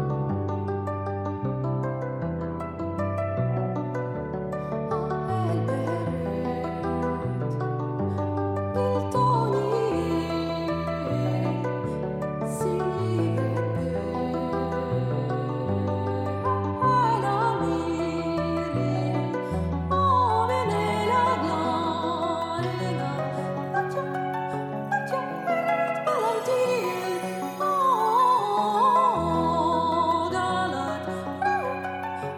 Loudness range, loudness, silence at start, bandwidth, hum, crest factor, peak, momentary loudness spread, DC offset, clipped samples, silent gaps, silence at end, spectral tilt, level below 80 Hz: 5 LU; -26 LUFS; 0 s; 19 kHz; none; 14 dB; -12 dBFS; 8 LU; under 0.1%; under 0.1%; none; 0 s; -7 dB/octave; -50 dBFS